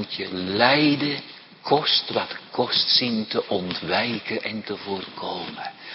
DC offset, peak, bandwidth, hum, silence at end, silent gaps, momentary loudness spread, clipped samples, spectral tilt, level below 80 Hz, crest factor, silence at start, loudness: under 0.1%; -2 dBFS; 5.8 kHz; none; 0 s; none; 14 LU; under 0.1%; -8 dB/octave; -66 dBFS; 22 dB; 0 s; -23 LUFS